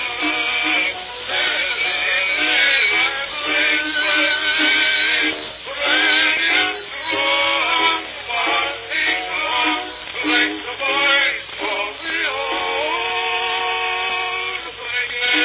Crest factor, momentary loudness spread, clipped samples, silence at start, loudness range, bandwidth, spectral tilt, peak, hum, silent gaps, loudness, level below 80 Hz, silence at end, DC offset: 16 dB; 9 LU; under 0.1%; 0 s; 4 LU; 4 kHz; 2.5 dB/octave; -4 dBFS; none; none; -17 LUFS; -54 dBFS; 0 s; under 0.1%